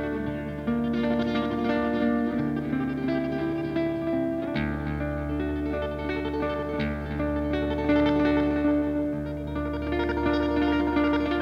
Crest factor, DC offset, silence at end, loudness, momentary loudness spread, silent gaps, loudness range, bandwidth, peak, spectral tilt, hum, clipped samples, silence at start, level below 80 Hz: 14 dB; under 0.1%; 0 s; -27 LUFS; 6 LU; none; 3 LU; 6.4 kHz; -12 dBFS; -8 dB/octave; none; under 0.1%; 0 s; -40 dBFS